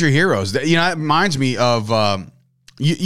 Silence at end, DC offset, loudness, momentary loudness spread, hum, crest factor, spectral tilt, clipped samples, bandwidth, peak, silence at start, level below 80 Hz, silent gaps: 0 s; 2%; -17 LUFS; 5 LU; none; 14 dB; -5 dB/octave; under 0.1%; 14.5 kHz; -4 dBFS; 0 s; -52 dBFS; none